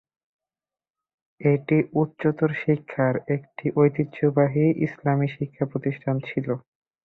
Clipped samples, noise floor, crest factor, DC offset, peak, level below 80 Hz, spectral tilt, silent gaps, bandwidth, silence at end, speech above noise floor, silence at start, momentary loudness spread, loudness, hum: under 0.1%; under -90 dBFS; 18 dB; under 0.1%; -6 dBFS; -62 dBFS; -11 dB/octave; none; 4.1 kHz; 0.45 s; over 67 dB; 1.4 s; 7 LU; -24 LUFS; none